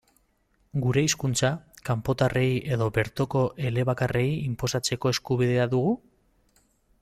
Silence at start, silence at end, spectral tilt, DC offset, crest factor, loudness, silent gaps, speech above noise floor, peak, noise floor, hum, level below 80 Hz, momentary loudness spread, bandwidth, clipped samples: 0.75 s; 1.05 s; -5.5 dB/octave; under 0.1%; 16 dB; -26 LUFS; none; 43 dB; -10 dBFS; -68 dBFS; none; -52 dBFS; 5 LU; 14.5 kHz; under 0.1%